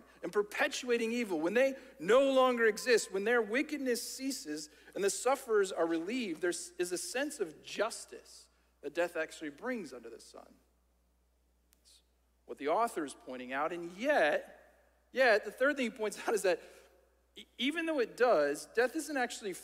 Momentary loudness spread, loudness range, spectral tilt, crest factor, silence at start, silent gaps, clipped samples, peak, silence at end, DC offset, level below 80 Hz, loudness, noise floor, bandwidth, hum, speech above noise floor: 13 LU; 12 LU; -2.5 dB/octave; 18 dB; 0.2 s; none; under 0.1%; -16 dBFS; 0 s; under 0.1%; -74 dBFS; -33 LUFS; -73 dBFS; 16 kHz; none; 39 dB